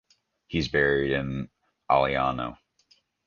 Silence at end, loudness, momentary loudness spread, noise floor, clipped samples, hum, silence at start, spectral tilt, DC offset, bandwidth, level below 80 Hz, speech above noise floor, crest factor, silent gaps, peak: 0.75 s; -26 LUFS; 13 LU; -65 dBFS; under 0.1%; none; 0.5 s; -6.5 dB/octave; under 0.1%; 7.2 kHz; -48 dBFS; 40 dB; 20 dB; none; -8 dBFS